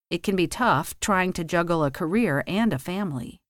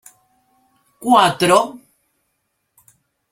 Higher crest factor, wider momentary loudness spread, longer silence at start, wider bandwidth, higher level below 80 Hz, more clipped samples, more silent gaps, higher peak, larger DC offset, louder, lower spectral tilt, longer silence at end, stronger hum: about the same, 16 dB vs 20 dB; second, 6 LU vs 14 LU; second, 0.1 s vs 1 s; about the same, 18 kHz vs 16.5 kHz; first, -50 dBFS vs -62 dBFS; neither; neither; second, -8 dBFS vs 0 dBFS; neither; second, -24 LUFS vs -15 LUFS; about the same, -5 dB/octave vs -4 dB/octave; second, 0.2 s vs 1.55 s; neither